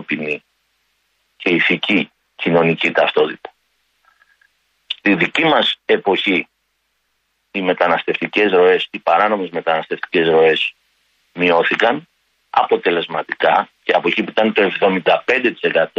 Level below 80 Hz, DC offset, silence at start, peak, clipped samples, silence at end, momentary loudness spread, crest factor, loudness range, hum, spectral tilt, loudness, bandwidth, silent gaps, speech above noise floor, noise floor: -62 dBFS; under 0.1%; 0 s; -2 dBFS; under 0.1%; 0.1 s; 9 LU; 16 dB; 2 LU; none; -6 dB/octave; -16 LUFS; 8 kHz; none; 52 dB; -68 dBFS